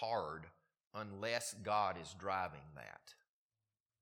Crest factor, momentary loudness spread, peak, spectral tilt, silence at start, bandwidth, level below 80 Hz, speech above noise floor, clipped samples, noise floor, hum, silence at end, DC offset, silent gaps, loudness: 22 dB; 17 LU; -22 dBFS; -3.5 dB/octave; 0 s; 15.5 kHz; -74 dBFS; over 48 dB; under 0.1%; under -90 dBFS; none; 0.9 s; under 0.1%; 0.87-0.91 s; -41 LUFS